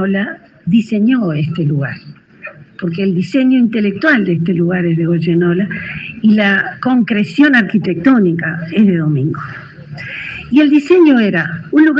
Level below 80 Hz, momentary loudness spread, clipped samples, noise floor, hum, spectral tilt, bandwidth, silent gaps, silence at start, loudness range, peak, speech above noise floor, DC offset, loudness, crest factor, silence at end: -52 dBFS; 15 LU; under 0.1%; -34 dBFS; none; -8 dB/octave; 7.6 kHz; none; 0 s; 3 LU; 0 dBFS; 22 dB; under 0.1%; -13 LUFS; 12 dB; 0 s